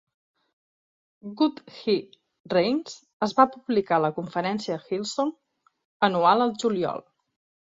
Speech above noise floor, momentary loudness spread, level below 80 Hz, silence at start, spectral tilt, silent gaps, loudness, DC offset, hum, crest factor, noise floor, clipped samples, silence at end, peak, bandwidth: over 66 dB; 10 LU; -70 dBFS; 1.25 s; -5.5 dB/octave; 2.40-2.44 s, 3.13-3.20 s, 5.85-6.00 s; -25 LUFS; under 0.1%; none; 22 dB; under -90 dBFS; under 0.1%; 0.75 s; -4 dBFS; 7.8 kHz